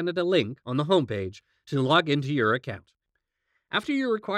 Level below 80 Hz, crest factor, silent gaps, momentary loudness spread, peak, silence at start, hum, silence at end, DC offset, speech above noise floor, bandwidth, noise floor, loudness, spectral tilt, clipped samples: -68 dBFS; 20 dB; none; 11 LU; -8 dBFS; 0 s; none; 0 s; under 0.1%; 54 dB; 11.5 kHz; -80 dBFS; -26 LUFS; -6.5 dB/octave; under 0.1%